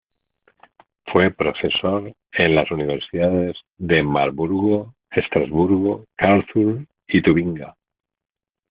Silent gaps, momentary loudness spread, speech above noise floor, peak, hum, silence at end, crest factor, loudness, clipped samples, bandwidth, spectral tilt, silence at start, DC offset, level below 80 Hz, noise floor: none; 10 LU; 44 dB; 0 dBFS; none; 1 s; 20 dB; -20 LUFS; under 0.1%; 5 kHz; -4.5 dB/octave; 1.05 s; under 0.1%; -50 dBFS; -63 dBFS